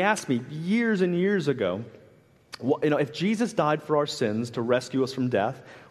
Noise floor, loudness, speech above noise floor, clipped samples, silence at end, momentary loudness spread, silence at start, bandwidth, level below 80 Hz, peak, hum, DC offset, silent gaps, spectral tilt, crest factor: -56 dBFS; -26 LUFS; 31 dB; under 0.1%; 0.05 s; 7 LU; 0 s; 13 kHz; -70 dBFS; -8 dBFS; none; under 0.1%; none; -6 dB/octave; 18 dB